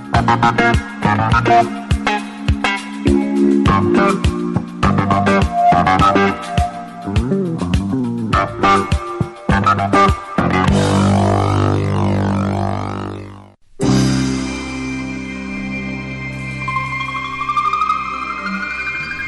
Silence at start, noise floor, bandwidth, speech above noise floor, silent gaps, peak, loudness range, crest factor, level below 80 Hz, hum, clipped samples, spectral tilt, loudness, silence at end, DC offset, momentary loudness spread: 0 s; -39 dBFS; 11.5 kHz; 25 dB; none; -4 dBFS; 6 LU; 12 dB; -30 dBFS; none; under 0.1%; -6.5 dB/octave; -16 LUFS; 0 s; under 0.1%; 11 LU